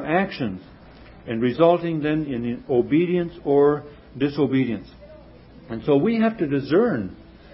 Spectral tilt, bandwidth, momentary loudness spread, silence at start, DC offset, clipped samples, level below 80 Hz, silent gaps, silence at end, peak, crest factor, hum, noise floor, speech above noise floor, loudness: -11.5 dB/octave; 5.8 kHz; 13 LU; 0 s; under 0.1%; under 0.1%; -52 dBFS; none; 0.3 s; -4 dBFS; 18 dB; none; -46 dBFS; 25 dB; -22 LUFS